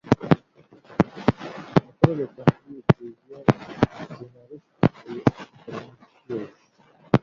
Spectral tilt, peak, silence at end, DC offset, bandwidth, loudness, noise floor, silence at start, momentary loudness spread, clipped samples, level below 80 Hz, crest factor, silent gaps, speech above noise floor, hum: -8.5 dB/octave; 0 dBFS; 0.05 s; under 0.1%; 7.2 kHz; -24 LUFS; -58 dBFS; 0.05 s; 17 LU; under 0.1%; -50 dBFS; 24 dB; none; 33 dB; none